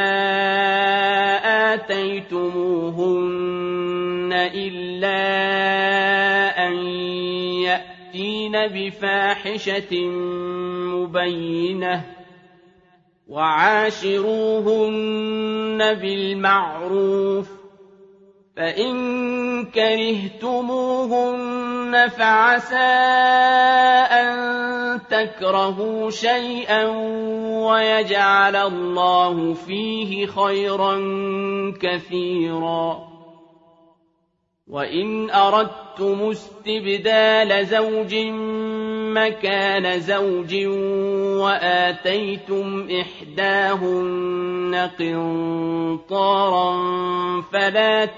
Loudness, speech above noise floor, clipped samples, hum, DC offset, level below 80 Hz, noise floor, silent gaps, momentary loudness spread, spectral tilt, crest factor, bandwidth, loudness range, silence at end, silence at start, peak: -20 LUFS; 50 dB; under 0.1%; none; under 0.1%; -64 dBFS; -70 dBFS; none; 9 LU; -5 dB/octave; 18 dB; 7.6 kHz; 6 LU; 0 s; 0 s; -2 dBFS